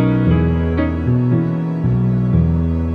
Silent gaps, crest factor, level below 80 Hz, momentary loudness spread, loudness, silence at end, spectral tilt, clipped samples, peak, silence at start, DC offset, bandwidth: none; 12 dB; -30 dBFS; 3 LU; -17 LUFS; 0 s; -11 dB/octave; under 0.1%; -4 dBFS; 0 s; under 0.1%; 4.7 kHz